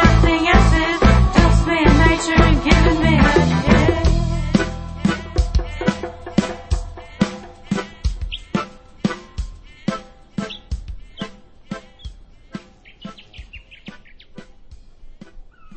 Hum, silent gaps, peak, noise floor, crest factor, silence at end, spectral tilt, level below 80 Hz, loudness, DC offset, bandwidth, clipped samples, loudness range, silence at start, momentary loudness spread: none; none; 0 dBFS; -41 dBFS; 18 dB; 0.35 s; -6 dB/octave; -22 dBFS; -18 LUFS; under 0.1%; 8.8 kHz; under 0.1%; 23 LU; 0 s; 23 LU